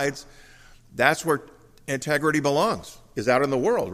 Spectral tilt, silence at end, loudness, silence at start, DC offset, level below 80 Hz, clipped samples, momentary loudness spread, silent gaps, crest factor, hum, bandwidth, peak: -4.5 dB/octave; 0 s; -24 LUFS; 0 s; under 0.1%; -56 dBFS; under 0.1%; 14 LU; none; 22 dB; none; 15.5 kHz; -4 dBFS